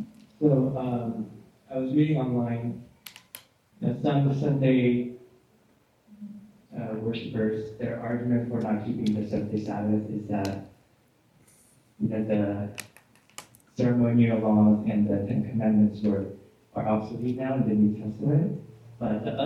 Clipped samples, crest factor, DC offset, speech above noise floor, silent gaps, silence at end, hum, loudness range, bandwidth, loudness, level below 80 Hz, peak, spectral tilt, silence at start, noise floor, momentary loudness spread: under 0.1%; 18 dB; under 0.1%; 38 dB; none; 0 s; none; 8 LU; 13 kHz; -27 LUFS; -60 dBFS; -10 dBFS; -8.5 dB/octave; 0 s; -64 dBFS; 20 LU